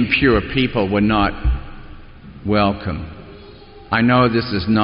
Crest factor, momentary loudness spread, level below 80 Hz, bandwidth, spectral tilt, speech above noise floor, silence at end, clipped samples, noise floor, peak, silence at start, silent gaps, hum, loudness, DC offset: 16 dB; 16 LU; -30 dBFS; 5.4 kHz; -4.5 dB/octave; 23 dB; 0 s; under 0.1%; -40 dBFS; -2 dBFS; 0 s; none; none; -17 LUFS; under 0.1%